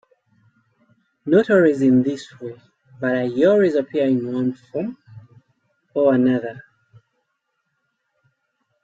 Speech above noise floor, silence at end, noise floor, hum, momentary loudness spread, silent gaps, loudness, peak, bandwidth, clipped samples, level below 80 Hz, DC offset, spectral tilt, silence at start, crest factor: 56 dB; 2.25 s; -74 dBFS; none; 17 LU; none; -19 LUFS; -4 dBFS; 7.8 kHz; under 0.1%; -64 dBFS; under 0.1%; -8 dB/octave; 1.25 s; 18 dB